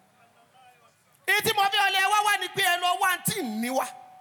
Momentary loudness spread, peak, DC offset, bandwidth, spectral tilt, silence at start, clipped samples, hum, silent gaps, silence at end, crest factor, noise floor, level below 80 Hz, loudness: 8 LU; -10 dBFS; under 0.1%; 19.5 kHz; -1.5 dB/octave; 1.25 s; under 0.1%; none; none; 0.15 s; 16 dB; -61 dBFS; -82 dBFS; -24 LUFS